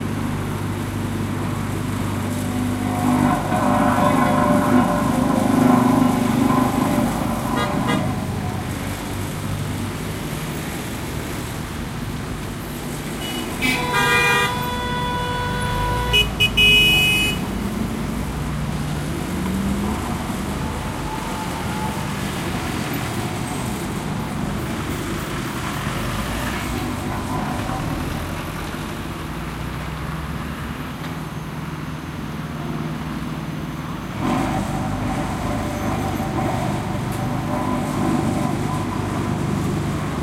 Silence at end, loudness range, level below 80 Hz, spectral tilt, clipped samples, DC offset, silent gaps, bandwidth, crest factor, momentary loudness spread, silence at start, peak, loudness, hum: 0 s; 11 LU; -36 dBFS; -5 dB/octave; under 0.1%; under 0.1%; none; 16 kHz; 20 dB; 11 LU; 0 s; -2 dBFS; -22 LUFS; none